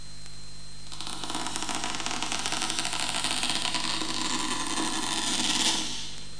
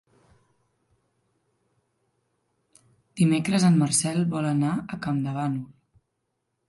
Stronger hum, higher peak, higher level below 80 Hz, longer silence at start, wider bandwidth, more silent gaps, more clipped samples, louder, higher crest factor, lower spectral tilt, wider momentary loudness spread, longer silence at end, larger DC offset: first, 50 Hz at -50 dBFS vs none; about the same, -8 dBFS vs -10 dBFS; first, -52 dBFS vs -64 dBFS; second, 0 s vs 3.15 s; about the same, 10.5 kHz vs 11.5 kHz; neither; neither; second, -28 LUFS vs -24 LUFS; first, 24 dB vs 18 dB; second, -1 dB/octave vs -5.5 dB/octave; first, 17 LU vs 11 LU; second, 0 s vs 1.05 s; first, 2% vs under 0.1%